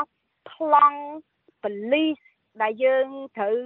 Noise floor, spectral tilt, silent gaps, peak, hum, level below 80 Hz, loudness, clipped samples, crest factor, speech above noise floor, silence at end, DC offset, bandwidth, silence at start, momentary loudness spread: -50 dBFS; -7.5 dB/octave; none; -6 dBFS; none; -80 dBFS; -23 LUFS; under 0.1%; 18 dB; 27 dB; 0 s; under 0.1%; 4.1 kHz; 0 s; 18 LU